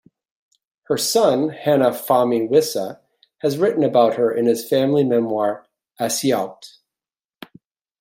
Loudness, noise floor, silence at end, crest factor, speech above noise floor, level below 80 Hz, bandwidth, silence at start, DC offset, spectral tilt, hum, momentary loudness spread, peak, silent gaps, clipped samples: -19 LUFS; under -90 dBFS; 1.35 s; 18 dB; over 72 dB; -68 dBFS; 16.5 kHz; 0.9 s; under 0.1%; -4.5 dB/octave; none; 9 LU; -2 dBFS; none; under 0.1%